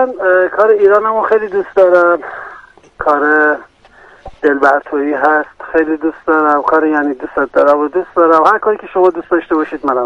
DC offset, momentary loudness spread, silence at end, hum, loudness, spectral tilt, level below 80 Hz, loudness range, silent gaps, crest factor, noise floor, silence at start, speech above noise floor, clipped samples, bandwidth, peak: under 0.1%; 8 LU; 0 s; none; -12 LUFS; -6.5 dB/octave; -48 dBFS; 2 LU; none; 12 dB; -42 dBFS; 0 s; 31 dB; under 0.1%; 7.8 kHz; 0 dBFS